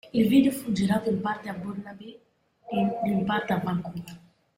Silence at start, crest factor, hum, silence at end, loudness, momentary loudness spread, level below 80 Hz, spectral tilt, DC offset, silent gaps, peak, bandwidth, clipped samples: 0.05 s; 18 dB; none; 0.4 s; -26 LUFS; 20 LU; -60 dBFS; -6.5 dB/octave; under 0.1%; none; -8 dBFS; 16 kHz; under 0.1%